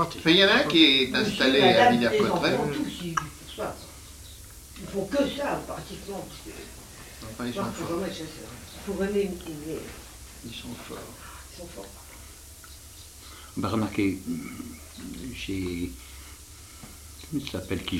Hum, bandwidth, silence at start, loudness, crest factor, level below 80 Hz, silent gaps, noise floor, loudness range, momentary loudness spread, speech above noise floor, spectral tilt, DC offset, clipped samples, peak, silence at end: none; 16 kHz; 0 s; -25 LUFS; 22 dB; -50 dBFS; none; -46 dBFS; 16 LU; 25 LU; 20 dB; -4 dB/octave; under 0.1%; under 0.1%; -4 dBFS; 0 s